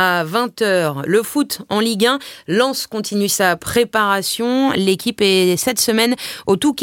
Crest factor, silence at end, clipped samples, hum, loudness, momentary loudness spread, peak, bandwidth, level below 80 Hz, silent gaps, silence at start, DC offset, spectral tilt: 16 dB; 0 s; under 0.1%; none; -17 LUFS; 5 LU; -2 dBFS; 17 kHz; -54 dBFS; none; 0 s; under 0.1%; -3.5 dB/octave